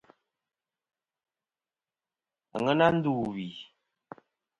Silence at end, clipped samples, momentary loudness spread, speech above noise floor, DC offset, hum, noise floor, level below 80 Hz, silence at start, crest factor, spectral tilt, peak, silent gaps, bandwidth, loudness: 0.95 s; under 0.1%; 17 LU; over 63 dB; under 0.1%; none; under -90 dBFS; -66 dBFS; 2.55 s; 24 dB; -7.5 dB/octave; -8 dBFS; none; 11 kHz; -27 LUFS